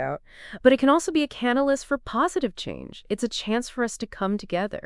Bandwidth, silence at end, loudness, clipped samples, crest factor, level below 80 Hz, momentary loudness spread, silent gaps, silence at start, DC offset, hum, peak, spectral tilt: 12 kHz; 0.05 s; -24 LUFS; under 0.1%; 22 dB; -52 dBFS; 14 LU; none; 0 s; under 0.1%; none; -4 dBFS; -4.5 dB/octave